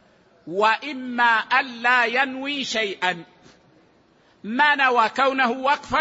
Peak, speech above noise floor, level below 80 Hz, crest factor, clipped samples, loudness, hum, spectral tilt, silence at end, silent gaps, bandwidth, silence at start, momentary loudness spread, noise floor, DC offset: -6 dBFS; 37 dB; -60 dBFS; 18 dB; under 0.1%; -20 LUFS; none; -3 dB/octave; 0 s; none; 8 kHz; 0.45 s; 10 LU; -58 dBFS; under 0.1%